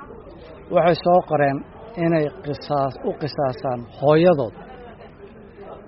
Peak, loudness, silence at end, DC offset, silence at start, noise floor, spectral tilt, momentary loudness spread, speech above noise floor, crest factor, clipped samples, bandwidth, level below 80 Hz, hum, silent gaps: -2 dBFS; -21 LUFS; 0 s; under 0.1%; 0 s; -43 dBFS; -6 dB/octave; 24 LU; 23 dB; 18 dB; under 0.1%; 5.8 kHz; -50 dBFS; none; none